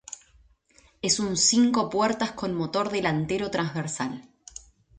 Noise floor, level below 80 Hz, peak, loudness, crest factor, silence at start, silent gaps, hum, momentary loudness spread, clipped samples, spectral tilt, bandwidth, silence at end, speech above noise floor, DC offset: -60 dBFS; -58 dBFS; -8 dBFS; -25 LUFS; 20 dB; 0.1 s; none; none; 22 LU; under 0.1%; -3.5 dB/octave; 9.6 kHz; 0.75 s; 35 dB; under 0.1%